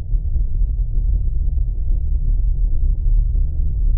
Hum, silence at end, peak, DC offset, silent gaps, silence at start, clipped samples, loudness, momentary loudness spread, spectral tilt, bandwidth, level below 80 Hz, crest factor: none; 0 s; -6 dBFS; under 0.1%; none; 0 s; under 0.1%; -23 LUFS; 3 LU; -16.5 dB/octave; 0.7 kHz; -16 dBFS; 10 dB